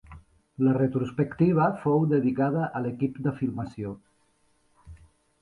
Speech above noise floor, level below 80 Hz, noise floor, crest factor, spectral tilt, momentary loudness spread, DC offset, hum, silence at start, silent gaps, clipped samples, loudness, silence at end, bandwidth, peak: 42 dB; -56 dBFS; -67 dBFS; 16 dB; -10.5 dB/octave; 12 LU; under 0.1%; none; 0.1 s; none; under 0.1%; -26 LUFS; 0.45 s; 10.5 kHz; -10 dBFS